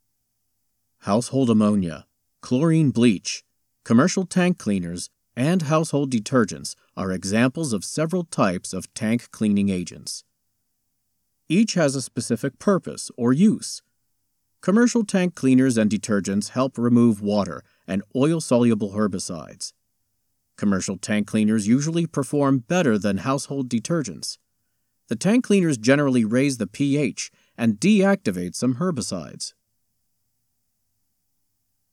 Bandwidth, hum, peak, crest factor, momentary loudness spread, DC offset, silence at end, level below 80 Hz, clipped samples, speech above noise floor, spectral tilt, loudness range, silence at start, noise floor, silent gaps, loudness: 13 kHz; none; -4 dBFS; 18 dB; 13 LU; under 0.1%; 2.45 s; -64 dBFS; under 0.1%; 53 dB; -5.5 dB/octave; 4 LU; 1.05 s; -75 dBFS; none; -22 LUFS